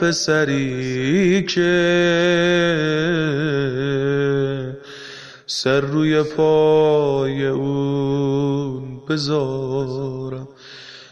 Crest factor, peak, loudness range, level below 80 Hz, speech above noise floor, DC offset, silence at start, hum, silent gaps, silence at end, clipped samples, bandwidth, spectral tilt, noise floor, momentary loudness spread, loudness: 14 dB; -6 dBFS; 4 LU; -50 dBFS; 22 dB; under 0.1%; 0 s; none; none; 0.05 s; under 0.1%; 10.5 kHz; -5.5 dB/octave; -40 dBFS; 15 LU; -19 LUFS